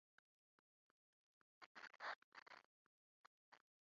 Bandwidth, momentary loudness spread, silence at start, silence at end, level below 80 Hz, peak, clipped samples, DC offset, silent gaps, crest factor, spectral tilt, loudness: 7.2 kHz; 13 LU; 1.6 s; 0.3 s; under -90 dBFS; -40 dBFS; under 0.1%; under 0.1%; 1.66-1.75 s, 2.16-2.32 s, 2.42-2.46 s, 2.65-3.52 s; 24 dB; 2.5 dB/octave; -57 LUFS